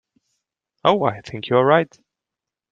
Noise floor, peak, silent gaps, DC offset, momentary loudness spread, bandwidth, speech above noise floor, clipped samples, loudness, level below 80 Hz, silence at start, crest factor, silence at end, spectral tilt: -87 dBFS; -2 dBFS; none; under 0.1%; 13 LU; 7.6 kHz; 68 dB; under 0.1%; -19 LUFS; -62 dBFS; 0.85 s; 20 dB; 0.85 s; -7 dB/octave